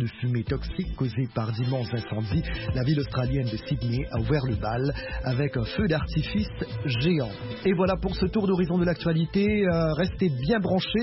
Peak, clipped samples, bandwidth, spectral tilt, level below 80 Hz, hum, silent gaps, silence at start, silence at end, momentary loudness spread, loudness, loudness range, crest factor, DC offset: -12 dBFS; under 0.1%; 5.8 kHz; -10.5 dB/octave; -38 dBFS; none; none; 0 s; 0 s; 6 LU; -27 LUFS; 3 LU; 14 dB; under 0.1%